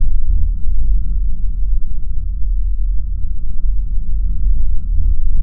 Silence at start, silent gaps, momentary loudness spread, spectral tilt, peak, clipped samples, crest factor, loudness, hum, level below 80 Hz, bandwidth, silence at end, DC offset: 0 s; none; 5 LU; -14 dB/octave; -2 dBFS; under 0.1%; 8 dB; -23 LUFS; none; -14 dBFS; 0.4 kHz; 0 s; under 0.1%